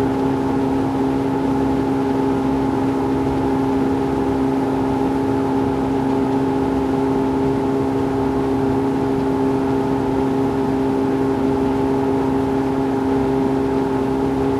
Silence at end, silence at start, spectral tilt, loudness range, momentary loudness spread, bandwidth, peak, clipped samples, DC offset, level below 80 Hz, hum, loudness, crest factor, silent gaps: 0 s; 0 s; -8 dB/octave; 0 LU; 1 LU; 12.5 kHz; -8 dBFS; under 0.1%; under 0.1%; -38 dBFS; none; -19 LUFS; 12 dB; none